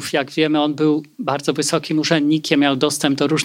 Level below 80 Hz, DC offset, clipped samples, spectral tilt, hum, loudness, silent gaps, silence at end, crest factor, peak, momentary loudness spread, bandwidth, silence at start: -66 dBFS; under 0.1%; under 0.1%; -4.5 dB/octave; none; -18 LUFS; none; 0 s; 16 dB; -2 dBFS; 5 LU; 16 kHz; 0 s